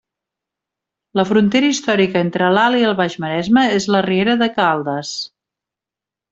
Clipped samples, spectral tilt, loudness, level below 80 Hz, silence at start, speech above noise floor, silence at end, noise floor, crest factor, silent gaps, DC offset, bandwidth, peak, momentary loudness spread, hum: under 0.1%; -5 dB/octave; -16 LUFS; -58 dBFS; 1.15 s; 72 dB; 1.05 s; -87 dBFS; 14 dB; none; under 0.1%; 8 kHz; -2 dBFS; 9 LU; none